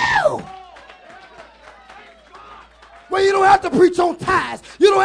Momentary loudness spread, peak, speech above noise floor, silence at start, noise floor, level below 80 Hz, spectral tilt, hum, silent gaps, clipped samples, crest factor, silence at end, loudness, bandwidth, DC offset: 16 LU; 0 dBFS; 30 dB; 0 s; -45 dBFS; -50 dBFS; -4.5 dB/octave; none; none; under 0.1%; 18 dB; 0 s; -16 LUFS; 10.5 kHz; under 0.1%